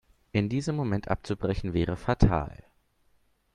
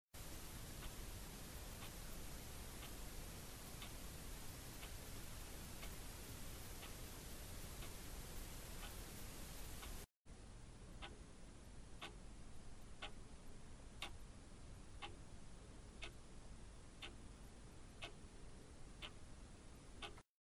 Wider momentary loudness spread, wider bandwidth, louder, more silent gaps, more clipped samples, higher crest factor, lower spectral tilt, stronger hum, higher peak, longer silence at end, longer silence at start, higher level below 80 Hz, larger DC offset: about the same, 7 LU vs 8 LU; second, 10.5 kHz vs 15.5 kHz; first, -29 LUFS vs -55 LUFS; second, none vs 10.17-10.25 s; neither; about the same, 22 dB vs 18 dB; first, -7.5 dB/octave vs -3.5 dB/octave; neither; first, -6 dBFS vs -34 dBFS; first, 1 s vs 0.2 s; first, 0.35 s vs 0.15 s; first, -40 dBFS vs -58 dBFS; neither